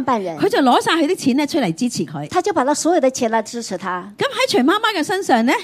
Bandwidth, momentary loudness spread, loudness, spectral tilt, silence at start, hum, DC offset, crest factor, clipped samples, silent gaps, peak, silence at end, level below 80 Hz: 15.5 kHz; 9 LU; -18 LUFS; -4 dB/octave; 0 s; none; under 0.1%; 16 dB; under 0.1%; none; 0 dBFS; 0 s; -62 dBFS